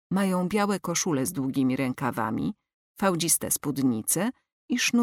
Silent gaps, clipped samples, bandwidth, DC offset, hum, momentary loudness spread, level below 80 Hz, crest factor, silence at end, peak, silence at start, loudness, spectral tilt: 2.74-2.95 s, 4.52-4.68 s; under 0.1%; 17.5 kHz; under 0.1%; none; 6 LU; -62 dBFS; 16 dB; 0 s; -10 dBFS; 0.1 s; -26 LUFS; -4 dB/octave